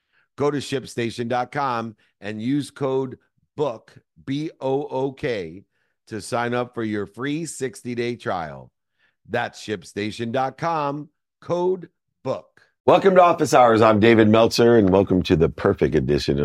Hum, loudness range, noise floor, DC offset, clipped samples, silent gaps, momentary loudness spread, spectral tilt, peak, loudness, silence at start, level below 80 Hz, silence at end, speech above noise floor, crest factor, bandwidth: none; 12 LU; -68 dBFS; under 0.1%; under 0.1%; 12.80-12.84 s; 16 LU; -6 dB/octave; -2 dBFS; -21 LUFS; 0.4 s; -48 dBFS; 0 s; 48 dB; 20 dB; 15.5 kHz